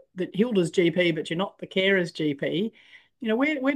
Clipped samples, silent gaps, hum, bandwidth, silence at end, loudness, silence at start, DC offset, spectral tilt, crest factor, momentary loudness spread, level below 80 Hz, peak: under 0.1%; none; none; 12.5 kHz; 0 s; -25 LUFS; 0.15 s; under 0.1%; -6 dB/octave; 16 dB; 8 LU; -72 dBFS; -10 dBFS